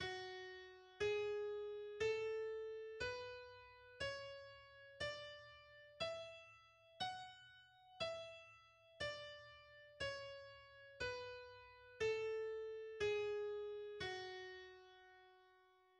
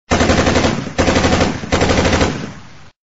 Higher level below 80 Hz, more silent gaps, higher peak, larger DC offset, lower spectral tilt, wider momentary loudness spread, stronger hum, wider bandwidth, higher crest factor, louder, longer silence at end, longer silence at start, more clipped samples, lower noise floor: second, -74 dBFS vs -26 dBFS; neither; second, -32 dBFS vs 0 dBFS; second, under 0.1% vs 1%; about the same, -3.5 dB/octave vs -4.5 dB/octave; first, 20 LU vs 6 LU; neither; first, 10 kHz vs 8 kHz; about the same, 18 dB vs 14 dB; second, -47 LUFS vs -15 LUFS; about the same, 0.35 s vs 0.45 s; about the same, 0 s vs 0.1 s; neither; first, -72 dBFS vs -38 dBFS